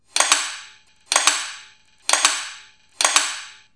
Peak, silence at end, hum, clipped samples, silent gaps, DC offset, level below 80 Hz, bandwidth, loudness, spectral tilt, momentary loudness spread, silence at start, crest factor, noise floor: 0 dBFS; 0.2 s; none; under 0.1%; none; 0.1%; -74 dBFS; 11 kHz; -18 LUFS; 3.5 dB/octave; 16 LU; 0.15 s; 22 dB; -49 dBFS